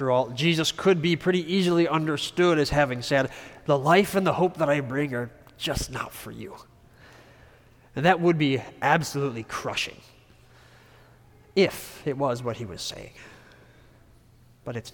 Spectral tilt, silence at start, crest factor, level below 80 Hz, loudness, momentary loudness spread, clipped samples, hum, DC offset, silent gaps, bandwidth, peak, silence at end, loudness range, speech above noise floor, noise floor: -5 dB/octave; 0 s; 20 dB; -52 dBFS; -25 LUFS; 15 LU; under 0.1%; none; under 0.1%; none; 19 kHz; -6 dBFS; 0 s; 7 LU; 31 dB; -56 dBFS